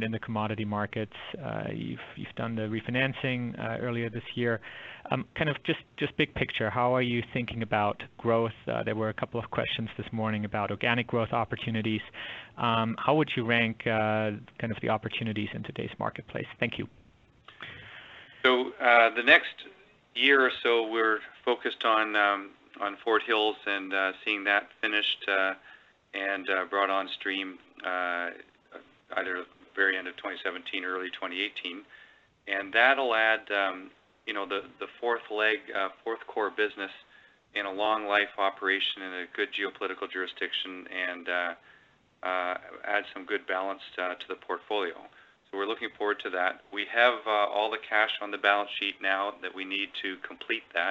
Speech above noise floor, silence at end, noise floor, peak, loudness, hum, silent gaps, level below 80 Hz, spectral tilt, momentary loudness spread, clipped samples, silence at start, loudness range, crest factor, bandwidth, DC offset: 32 dB; 0 s; -62 dBFS; -6 dBFS; -29 LUFS; none; none; -66 dBFS; -6.5 dB/octave; 13 LU; under 0.1%; 0 s; 7 LU; 24 dB; 7.8 kHz; under 0.1%